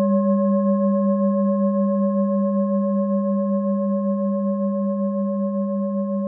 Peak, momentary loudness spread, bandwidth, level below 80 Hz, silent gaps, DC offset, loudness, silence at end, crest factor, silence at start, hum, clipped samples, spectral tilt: -10 dBFS; 4 LU; 1.8 kHz; -90 dBFS; none; under 0.1%; -21 LUFS; 0 s; 10 dB; 0 s; none; under 0.1%; -17 dB/octave